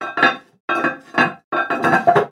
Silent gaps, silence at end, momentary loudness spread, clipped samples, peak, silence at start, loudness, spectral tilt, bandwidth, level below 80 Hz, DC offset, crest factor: 0.60-0.68 s, 1.44-1.51 s; 0 s; 8 LU; under 0.1%; 0 dBFS; 0 s; -18 LUFS; -5.5 dB/octave; 14 kHz; -62 dBFS; under 0.1%; 18 dB